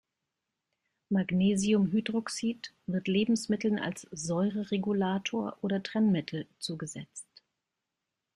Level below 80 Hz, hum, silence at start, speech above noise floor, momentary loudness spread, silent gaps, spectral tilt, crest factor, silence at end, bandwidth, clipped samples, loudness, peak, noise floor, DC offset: -68 dBFS; none; 1.1 s; 57 dB; 12 LU; none; -5.5 dB/octave; 16 dB; 1.15 s; 11.5 kHz; under 0.1%; -31 LUFS; -16 dBFS; -87 dBFS; under 0.1%